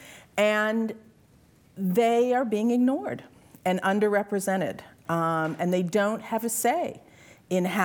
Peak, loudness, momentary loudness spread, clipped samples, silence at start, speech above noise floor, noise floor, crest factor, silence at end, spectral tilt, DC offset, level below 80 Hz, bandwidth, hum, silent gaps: -8 dBFS; -26 LUFS; 11 LU; under 0.1%; 0 s; 33 dB; -58 dBFS; 18 dB; 0 s; -5 dB/octave; under 0.1%; -70 dBFS; over 20 kHz; none; none